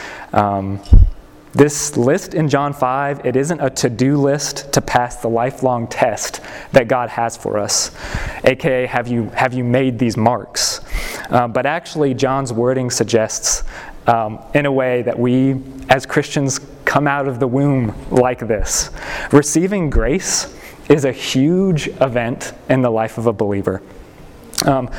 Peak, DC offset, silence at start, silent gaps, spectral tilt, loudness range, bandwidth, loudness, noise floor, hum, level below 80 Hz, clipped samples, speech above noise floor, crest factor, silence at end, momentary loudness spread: 0 dBFS; under 0.1%; 0 s; none; -4.5 dB/octave; 2 LU; 17.5 kHz; -17 LUFS; -38 dBFS; none; -26 dBFS; under 0.1%; 22 dB; 16 dB; 0 s; 7 LU